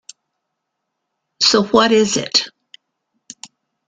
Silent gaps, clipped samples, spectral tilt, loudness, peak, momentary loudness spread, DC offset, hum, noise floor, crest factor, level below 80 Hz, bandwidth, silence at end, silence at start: none; under 0.1%; -2.5 dB/octave; -14 LUFS; 0 dBFS; 24 LU; under 0.1%; none; -77 dBFS; 20 dB; -56 dBFS; 9.6 kHz; 1.4 s; 1.4 s